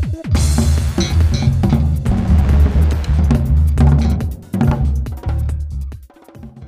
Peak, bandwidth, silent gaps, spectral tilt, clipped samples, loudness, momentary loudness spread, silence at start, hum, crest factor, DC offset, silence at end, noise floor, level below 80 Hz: 0 dBFS; 13 kHz; none; -7 dB/octave; under 0.1%; -16 LUFS; 9 LU; 0 s; none; 14 dB; under 0.1%; 0 s; -37 dBFS; -16 dBFS